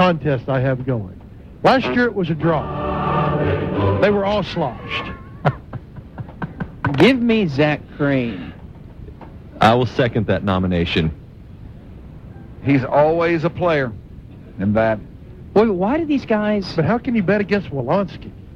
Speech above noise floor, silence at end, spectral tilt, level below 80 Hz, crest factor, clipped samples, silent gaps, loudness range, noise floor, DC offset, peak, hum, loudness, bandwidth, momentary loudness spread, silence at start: 20 dB; 0 s; -8 dB/octave; -40 dBFS; 20 dB; under 0.1%; none; 2 LU; -38 dBFS; under 0.1%; 0 dBFS; none; -19 LUFS; 10 kHz; 23 LU; 0 s